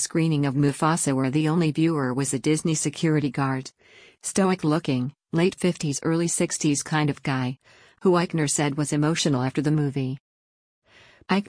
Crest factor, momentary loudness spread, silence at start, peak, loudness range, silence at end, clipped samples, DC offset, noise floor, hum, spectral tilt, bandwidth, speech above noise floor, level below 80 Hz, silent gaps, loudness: 14 dB; 6 LU; 0 s; -10 dBFS; 2 LU; 0 s; under 0.1%; under 0.1%; under -90 dBFS; none; -5 dB/octave; 10.5 kHz; over 67 dB; -60 dBFS; 10.20-10.82 s; -24 LUFS